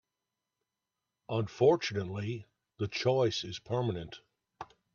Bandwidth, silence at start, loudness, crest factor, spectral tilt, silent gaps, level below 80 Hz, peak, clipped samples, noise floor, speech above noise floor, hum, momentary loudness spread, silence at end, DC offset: 7.2 kHz; 1.3 s; -32 LUFS; 20 dB; -6 dB/octave; none; -68 dBFS; -14 dBFS; under 0.1%; -88 dBFS; 57 dB; none; 22 LU; 0.3 s; under 0.1%